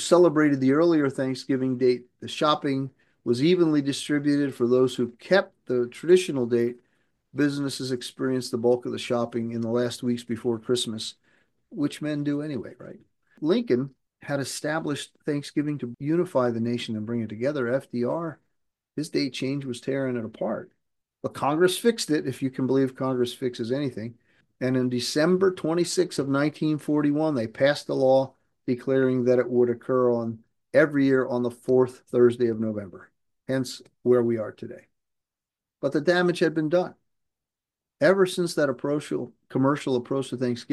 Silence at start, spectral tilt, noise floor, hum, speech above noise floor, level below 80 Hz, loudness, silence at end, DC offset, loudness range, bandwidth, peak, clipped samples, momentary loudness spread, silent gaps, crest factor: 0 s; -5.5 dB/octave; -90 dBFS; none; 65 dB; -72 dBFS; -25 LUFS; 0 s; under 0.1%; 6 LU; 12.5 kHz; -6 dBFS; under 0.1%; 11 LU; none; 20 dB